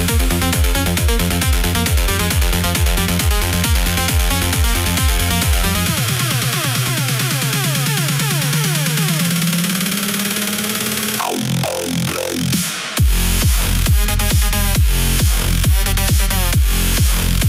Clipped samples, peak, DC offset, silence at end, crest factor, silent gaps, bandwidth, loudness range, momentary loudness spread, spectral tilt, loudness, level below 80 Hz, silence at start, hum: under 0.1%; -2 dBFS; under 0.1%; 0 s; 14 dB; none; 16.5 kHz; 2 LU; 2 LU; -3.5 dB/octave; -16 LUFS; -20 dBFS; 0 s; none